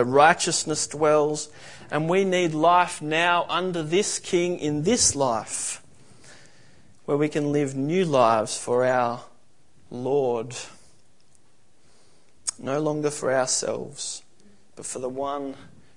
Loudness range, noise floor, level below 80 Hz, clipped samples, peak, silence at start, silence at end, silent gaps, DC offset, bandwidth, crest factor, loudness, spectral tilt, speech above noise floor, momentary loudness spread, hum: 8 LU; -63 dBFS; -62 dBFS; under 0.1%; -2 dBFS; 0 s; 0.3 s; none; 0.4%; 11 kHz; 22 dB; -23 LUFS; -3.5 dB/octave; 40 dB; 15 LU; none